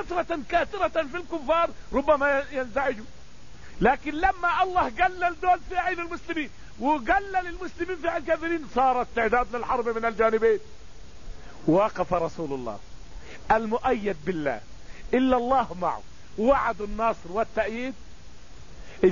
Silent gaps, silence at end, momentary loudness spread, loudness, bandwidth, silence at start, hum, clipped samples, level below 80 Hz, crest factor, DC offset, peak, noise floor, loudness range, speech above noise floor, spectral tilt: none; 0 s; 10 LU; -26 LUFS; 7.4 kHz; 0 s; none; under 0.1%; -44 dBFS; 18 dB; 1%; -8 dBFS; -48 dBFS; 3 LU; 22 dB; -6 dB/octave